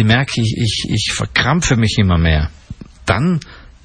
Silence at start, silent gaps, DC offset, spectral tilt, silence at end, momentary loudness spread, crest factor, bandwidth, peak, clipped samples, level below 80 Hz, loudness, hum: 0 s; none; under 0.1%; -5 dB/octave; 0.15 s; 11 LU; 14 dB; 10 kHz; -2 dBFS; under 0.1%; -28 dBFS; -16 LUFS; none